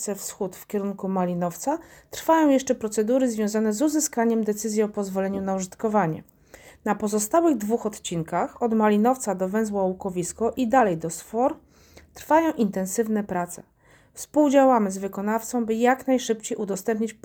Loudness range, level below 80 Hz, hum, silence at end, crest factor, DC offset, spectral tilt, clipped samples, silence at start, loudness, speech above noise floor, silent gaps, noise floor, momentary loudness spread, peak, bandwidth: 3 LU; -60 dBFS; none; 0.1 s; 18 dB; under 0.1%; -5 dB/octave; under 0.1%; 0 s; -24 LUFS; 29 dB; none; -52 dBFS; 10 LU; -6 dBFS; over 20 kHz